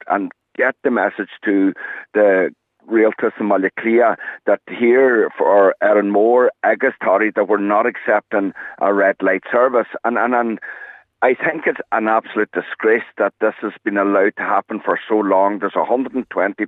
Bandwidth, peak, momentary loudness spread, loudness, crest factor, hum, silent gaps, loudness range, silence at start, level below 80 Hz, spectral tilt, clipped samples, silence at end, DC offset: 4 kHz; -2 dBFS; 7 LU; -17 LUFS; 16 dB; none; none; 4 LU; 0.05 s; -74 dBFS; -8.5 dB/octave; under 0.1%; 0 s; under 0.1%